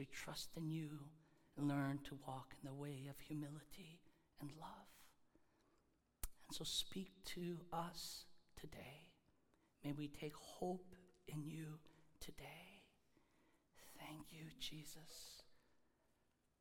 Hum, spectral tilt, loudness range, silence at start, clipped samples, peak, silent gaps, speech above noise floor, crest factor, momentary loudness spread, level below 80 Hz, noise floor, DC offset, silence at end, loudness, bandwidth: none; -4.5 dB/octave; 9 LU; 0 s; under 0.1%; -30 dBFS; none; 32 dB; 24 dB; 19 LU; -70 dBFS; -82 dBFS; under 0.1%; 0.8 s; -51 LUFS; 18 kHz